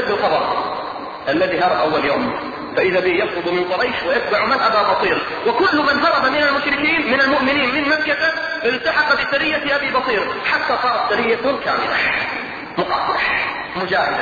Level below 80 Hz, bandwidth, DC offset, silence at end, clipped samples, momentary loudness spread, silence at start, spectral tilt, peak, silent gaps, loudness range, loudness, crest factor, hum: -50 dBFS; 7.2 kHz; under 0.1%; 0 s; under 0.1%; 7 LU; 0 s; -5 dB/octave; -4 dBFS; none; 3 LU; -17 LUFS; 14 dB; none